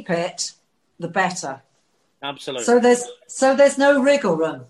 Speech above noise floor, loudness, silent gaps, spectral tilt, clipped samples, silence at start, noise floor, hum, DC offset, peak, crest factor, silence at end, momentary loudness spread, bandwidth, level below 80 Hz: 47 dB; -19 LUFS; none; -4 dB/octave; under 0.1%; 0 s; -66 dBFS; none; under 0.1%; -4 dBFS; 16 dB; 0.05 s; 17 LU; 12 kHz; -68 dBFS